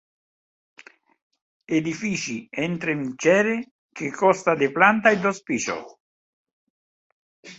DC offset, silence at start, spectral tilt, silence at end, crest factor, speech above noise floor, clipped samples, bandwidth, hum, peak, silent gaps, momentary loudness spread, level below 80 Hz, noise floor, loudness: under 0.1%; 1.7 s; -4.5 dB/octave; 0.05 s; 24 dB; over 68 dB; under 0.1%; 8.2 kHz; none; -2 dBFS; 3.71-3.89 s, 6.00-6.45 s, 6.53-7.43 s; 12 LU; -66 dBFS; under -90 dBFS; -22 LUFS